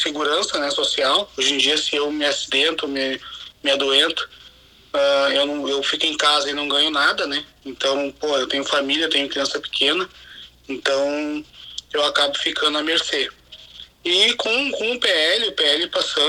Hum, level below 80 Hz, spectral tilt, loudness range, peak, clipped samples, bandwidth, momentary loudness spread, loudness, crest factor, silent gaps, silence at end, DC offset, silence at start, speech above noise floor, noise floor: none; -58 dBFS; -1 dB/octave; 3 LU; -4 dBFS; under 0.1%; 16 kHz; 11 LU; -19 LUFS; 18 dB; none; 0 s; under 0.1%; 0 s; 28 dB; -48 dBFS